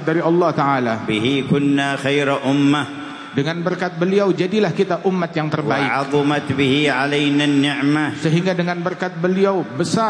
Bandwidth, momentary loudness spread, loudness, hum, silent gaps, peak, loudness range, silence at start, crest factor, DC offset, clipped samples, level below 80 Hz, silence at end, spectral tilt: 10.5 kHz; 5 LU; -18 LUFS; none; none; -4 dBFS; 2 LU; 0 s; 14 dB; under 0.1%; under 0.1%; -60 dBFS; 0 s; -6 dB/octave